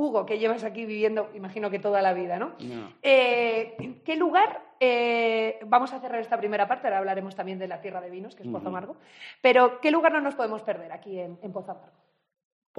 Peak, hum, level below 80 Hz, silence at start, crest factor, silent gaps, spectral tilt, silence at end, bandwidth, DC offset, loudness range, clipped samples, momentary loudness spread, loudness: -6 dBFS; none; -82 dBFS; 0 s; 20 dB; none; -6 dB/octave; 1 s; 10 kHz; under 0.1%; 4 LU; under 0.1%; 17 LU; -25 LUFS